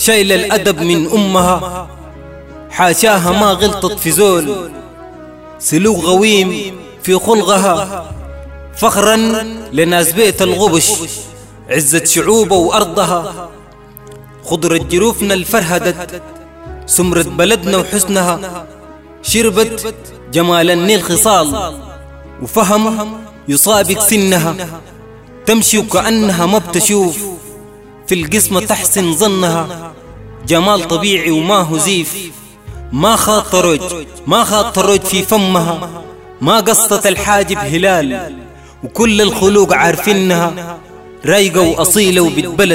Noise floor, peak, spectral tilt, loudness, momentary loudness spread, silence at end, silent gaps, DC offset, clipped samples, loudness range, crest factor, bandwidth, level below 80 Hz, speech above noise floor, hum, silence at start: -36 dBFS; 0 dBFS; -3.5 dB/octave; -11 LUFS; 17 LU; 0 s; none; under 0.1%; under 0.1%; 2 LU; 12 dB; 16.5 kHz; -36 dBFS; 24 dB; none; 0 s